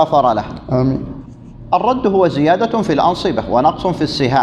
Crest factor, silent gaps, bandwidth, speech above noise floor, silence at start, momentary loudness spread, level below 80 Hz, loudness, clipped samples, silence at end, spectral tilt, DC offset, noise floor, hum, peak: 14 dB; none; 11 kHz; 20 dB; 0 s; 7 LU; -40 dBFS; -15 LUFS; under 0.1%; 0 s; -7 dB/octave; under 0.1%; -34 dBFS; none; 0 dBFS